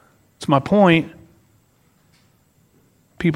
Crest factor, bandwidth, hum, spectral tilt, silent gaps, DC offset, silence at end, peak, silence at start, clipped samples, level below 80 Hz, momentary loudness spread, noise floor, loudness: 20 dB; 12 kHz; none; -7 dB/octave; none; under 0.1%; 0 s; 0 dBFS; 0.4 s; under 0.1%; -54 dBFS; 16 LU; -59 dBFS; -17 LUFS